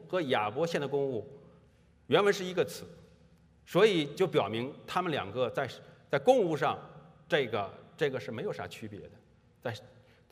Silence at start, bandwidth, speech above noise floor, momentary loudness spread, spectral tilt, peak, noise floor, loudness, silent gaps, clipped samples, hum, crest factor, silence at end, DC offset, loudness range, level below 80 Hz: 0 s; 15.5 kHz; 32 dB; 17 LU; -5.5 dB/octave; -10 dBFS; -62 dBFS; -31 LUFS; none; under 0.1%; none; 22 dB; 0.45 s; under 0.1%; 6 LU; -72 dBFS